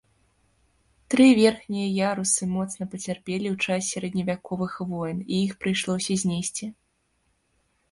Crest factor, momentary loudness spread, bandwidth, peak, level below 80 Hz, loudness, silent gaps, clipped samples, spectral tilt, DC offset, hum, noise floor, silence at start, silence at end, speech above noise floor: 20 dB; 12 LU; 11.5 kHz; -6 dBFS; -60 dBFS; -25 LUFS; none; under 0.1%; -4.5 dB/octave; under 0.1%; none; -70 dBFS; 1.1 s; 1.2 s; 46 dB